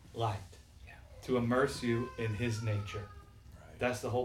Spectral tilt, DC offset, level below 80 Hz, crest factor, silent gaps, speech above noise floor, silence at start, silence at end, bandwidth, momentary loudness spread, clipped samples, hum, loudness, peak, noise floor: -6 dB/octave; under 0.1%; -56 dBFS; 18 dB; none; 20 dB; 0 s; 0 s; 15.5 kHz; 23 LU; under 0.1%; none; -35 LUFS; -16 dBFS; -54 dBFS